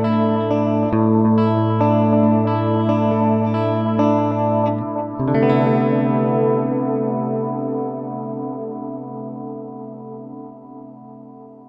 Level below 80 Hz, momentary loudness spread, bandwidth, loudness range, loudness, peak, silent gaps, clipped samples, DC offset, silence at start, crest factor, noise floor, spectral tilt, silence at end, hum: -56 dBFS; 18 LU; 6 kHz; 12 LU; -18 LUFS; -2 dBFS; none; under 0.1%; under 0.1%; 0 s; 16 dB; -40 dBFS; -10.5 dB/octave; 0.05 s; none